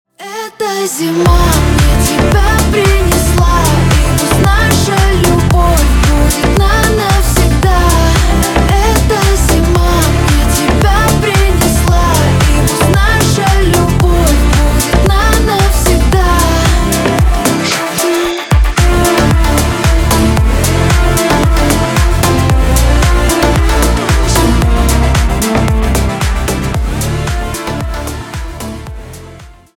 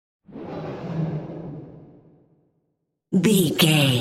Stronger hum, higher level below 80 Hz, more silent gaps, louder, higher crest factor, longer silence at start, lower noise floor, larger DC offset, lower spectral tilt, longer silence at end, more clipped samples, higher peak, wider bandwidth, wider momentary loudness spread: neither; first, -14 dBFS vs -58 dBFS; neither; first, -10 LUFS vs -21 LUFS; second, 10 dB vs 20 dB; about the same, 0.2 s vs 0.3 s; second, -34 dBFS vs -75 dBFS; neither; about the same, -5 dB/octave vs -5 dB/octave; first, 0.25 s vs 0 s; neither; first, 0 dBFS vs -4 dBFS; first, 18.5 kHz vs 16 kHz; second, 6 LU vs 22 LU